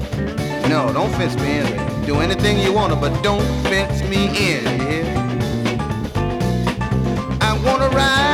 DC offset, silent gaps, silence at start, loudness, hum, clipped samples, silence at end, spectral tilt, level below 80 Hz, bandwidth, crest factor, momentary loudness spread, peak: under 0.1%; none; 0 s; -18 LUFS; none; under 0.1%; 0 s; -5.5 dB/octave; -30 dBFS; 16.5 kHz; 14 dB; 5 LU; -4 dBFS